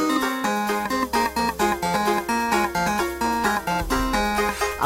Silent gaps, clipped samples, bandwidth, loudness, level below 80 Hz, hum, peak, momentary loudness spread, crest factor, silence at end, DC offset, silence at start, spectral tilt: none; under 0.1%; 16.5 kHz; -23 LUFS; -38 dBFS; none; -8 dBFS; 2 LU; 16 dB; 0 s; under 0.1%; 0 s; -3.5 dB/octave